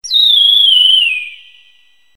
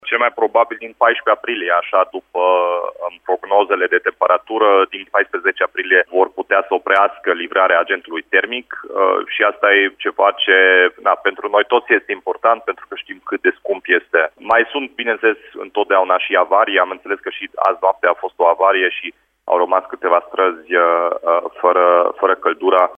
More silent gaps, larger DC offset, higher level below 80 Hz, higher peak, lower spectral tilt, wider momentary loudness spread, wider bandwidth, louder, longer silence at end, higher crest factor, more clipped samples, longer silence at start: neither; first, 0.5% vs under 0.1%; about the same, -66 dBFS vs -66 dBFS; about the same, 0 dBFS vs 0 dBFS; second, 5 dB/octave vs -4.5 dB/octave; first, 13 LU vs 9 LU; first, 17.5 kHz vs 4.7 kHz; first, -6 LUFS vs -16 LUFS; first, 0.8 s vs 0.05 s; about the same, 12 dB vs 16 dB; neither; about the same, 0.05 s vs 0.05 s